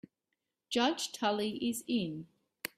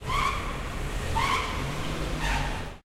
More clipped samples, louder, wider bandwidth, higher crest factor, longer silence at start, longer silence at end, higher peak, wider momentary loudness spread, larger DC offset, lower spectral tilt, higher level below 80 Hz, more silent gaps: neither; second, -34 LUFS vs -29 LUFS; about the same, 15.5 kHz vs 16 kHz; about the same, 20 dB vs 16 dB; first, 0.7 s vs 0 s; about the same, 0.1 s vs 0.05 s; second, -16 dBFS vs -12 dBFS; first, 10 LU vs 7 LU; neither; about the same, -3.5 dB/octave vs -4 dB/octave; second, -76 dBFS vs -34 dBFS; neither